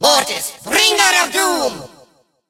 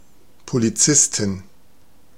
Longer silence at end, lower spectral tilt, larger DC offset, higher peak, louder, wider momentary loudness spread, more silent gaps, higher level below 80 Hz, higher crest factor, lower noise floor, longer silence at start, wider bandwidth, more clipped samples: about the same, 0.65 s vs 0.75 s; second, 0 dB/octave vs -3 dB/octave; second, under 0.1% vs 0.7%; about the same, 0 dBFS vs -2 dBFS; first, -14 LUFS vs -17 LUFS; about the same, 12 LU vs 13 LU; neither; about the same, -54 dBFS vs -56 dBFS; about the same, 16 dB vs 20 dB; second, -52 dBFS vs -56 dBFS; second, 0 s vs 0.45 s; about the same, 16 kHz vs 16.5 kHz; neither